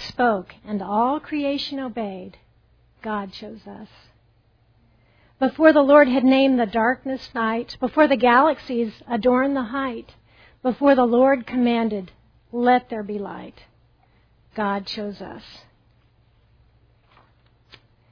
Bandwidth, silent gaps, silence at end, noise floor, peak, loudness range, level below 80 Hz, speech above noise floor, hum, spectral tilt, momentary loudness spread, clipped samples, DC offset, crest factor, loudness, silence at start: 5.4 kHz; none; 2.55 s; -60 dBFS; -2 dBFS; 15 LU; -56 dBFS; 39 dB; none; -7 dB/octave; 21 LU; under 0.1%; under 0.1%; 20 dB; -20 LUFS; 0 s